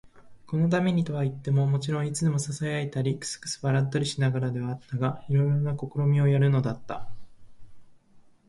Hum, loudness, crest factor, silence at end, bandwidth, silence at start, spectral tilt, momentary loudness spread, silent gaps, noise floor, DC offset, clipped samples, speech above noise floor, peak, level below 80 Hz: none; -27 LUFS; 14 dB; 0.3 s; 11.5 kHz; 0.05 s; -6.5 dB/octave; 9 LU; none; -54 dBFS; under 0.1%; under 0.1%; 29 dB; -12 dBFS; -58 dBFS